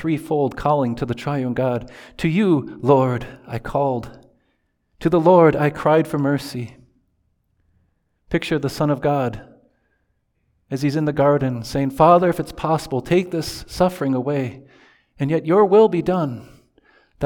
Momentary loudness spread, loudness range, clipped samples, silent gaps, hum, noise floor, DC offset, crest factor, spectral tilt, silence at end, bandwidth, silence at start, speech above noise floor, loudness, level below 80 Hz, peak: 14 LU; 6 LU; under 0.1%; none; none; -68 dBFS; under 0.1%; 18 dB; -7.5 dB/octave; 0 s; 19 kHz; 0 s; 49 dB; -19 LUFS; -48 dBFS; -2 dBFS